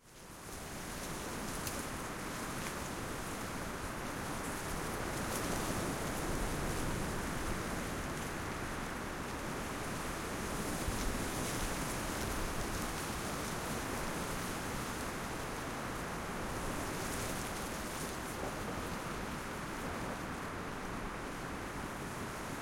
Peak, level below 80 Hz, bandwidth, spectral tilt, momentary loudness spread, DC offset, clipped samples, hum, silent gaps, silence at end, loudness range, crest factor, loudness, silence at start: -22 dBFS; -48 dBFS; 16.5 kHz; -4 dB/octave; 4 LU; under 0.1%; under 0.1%; none; none; 0 s; 3 LU; 16 dB; -40 LUFS; 0 s